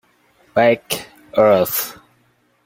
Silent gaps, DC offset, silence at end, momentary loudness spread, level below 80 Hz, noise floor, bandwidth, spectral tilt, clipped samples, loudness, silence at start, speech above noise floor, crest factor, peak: none; under 0.1%; 0.75 s; 12 LU; -58 dBFS; -60 dBFS; 17 kHz; -4 dB/octave; under 0.1%; -17 LUFS; 0.55 s; 45 dB; 18 dB; 0 dBFS